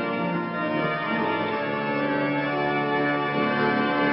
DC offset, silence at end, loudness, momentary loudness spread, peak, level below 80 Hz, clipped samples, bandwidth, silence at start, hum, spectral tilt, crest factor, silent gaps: under 0.1%; 0 s; -25 LUFS; 4 LU; -10 dBFS; -62 dBFS; under 0.1%; 5.6 kHz; 0 s; none; -10.5 dB/octave; 14 dB; none